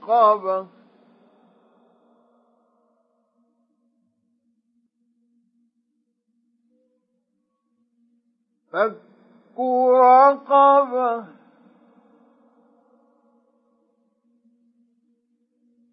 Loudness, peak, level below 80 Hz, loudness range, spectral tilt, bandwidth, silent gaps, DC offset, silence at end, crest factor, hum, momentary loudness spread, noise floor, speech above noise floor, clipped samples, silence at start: -18 LUFS; -4 dBFS; under -90 dBFS; 15 LU; -7.5 dB/octave; 5.6 kHz; none; under 0.1%; 4.65 s; 20 dB; none; 18 LU; -74 dBFS; 57 dB; under 0.1%; 0.05 s